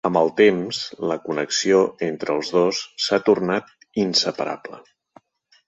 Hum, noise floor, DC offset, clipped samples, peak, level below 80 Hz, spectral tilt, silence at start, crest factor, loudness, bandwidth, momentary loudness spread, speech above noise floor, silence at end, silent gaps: none; -59 dBFS; under 0.1%; under 0.1%; -4 dBFS; -66 dBFS; -4 dB/octave; 0.05 s; 18 dB; -21 LUFS; 8.2 kHz; 10 LU; 39 dB; 0.85 s; none